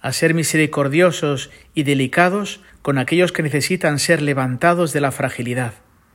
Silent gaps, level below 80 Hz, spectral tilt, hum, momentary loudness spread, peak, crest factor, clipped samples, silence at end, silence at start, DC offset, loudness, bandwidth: none; -56 dBFS; -5 dB/octave; none; 9 LU; 0 dBFS; 18 dB; under 0.1%; 0.4 s; 0.05 s; under 0.1%; -18 LUFS; 16.5 kHz